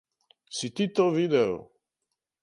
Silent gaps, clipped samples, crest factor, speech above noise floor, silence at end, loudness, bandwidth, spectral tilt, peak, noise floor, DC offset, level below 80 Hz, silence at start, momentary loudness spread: none; under 0.1%; 18 dB; 59 dB; 0.8 s; -26 LUFS; 11.5 kHz; -5.5 dB/octave; -10 dBFS; -84 dBFS; under 0.1%; -68 dBFS; 0.5 s; 13 LU